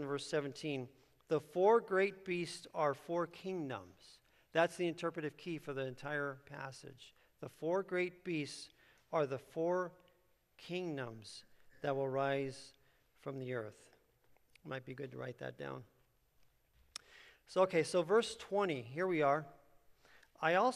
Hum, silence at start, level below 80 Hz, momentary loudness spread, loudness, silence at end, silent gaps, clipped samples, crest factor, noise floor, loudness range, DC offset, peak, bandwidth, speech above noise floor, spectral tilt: none; 0 s; -78 dBFS; 19 LU; -38 LUFS; 0 s; none; under 0.1%; 22 dB; -74 dBFS; 11 LU; under 0.1%; -18 dBFS; 13 kHz; 36 dB; -5.5 dB/octave